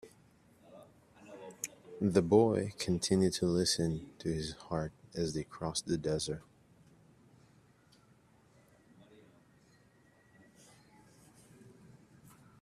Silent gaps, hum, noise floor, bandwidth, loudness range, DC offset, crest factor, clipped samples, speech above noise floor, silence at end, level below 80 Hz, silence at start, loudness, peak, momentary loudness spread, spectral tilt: none; none; -66 dBFS; 14.5 kHz; 10 LU; under 0.1%; 24 dB; under 0.1%; 33 dB; 6.2 s; -62 dBFS; 0.05 s; -33 LUFS; -14 dBFS; 16 LU; -5 dB/octave